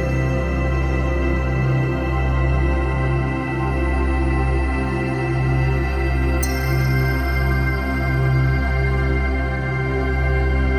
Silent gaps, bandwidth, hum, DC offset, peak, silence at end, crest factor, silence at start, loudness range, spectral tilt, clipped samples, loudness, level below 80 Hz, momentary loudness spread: none; 20 kHz; none; under 0.1%; -8 dBFS; 0 s; 12 dB; 0 s; 1 LU; -7 dB/octave; under 0.1%; -20 LUFS; -22 dBFS; 3 LU